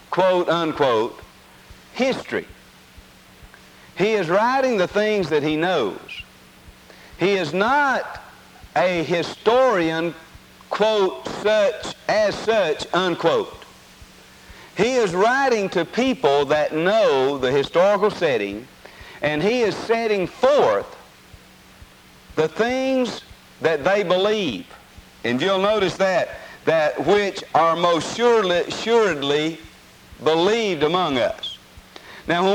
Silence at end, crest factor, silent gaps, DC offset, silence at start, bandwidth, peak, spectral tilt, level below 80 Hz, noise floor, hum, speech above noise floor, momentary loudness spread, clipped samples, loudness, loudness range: 0 s; 18 dB; none; under 0.1%; 0.1 s; 17 kHz; -2 dBFS; -4.5 dB/octave; -54 dBFS; -47 dBFS; none; 27 dB; 11 LU; under 0.1%; -20 LUFS; 4 LU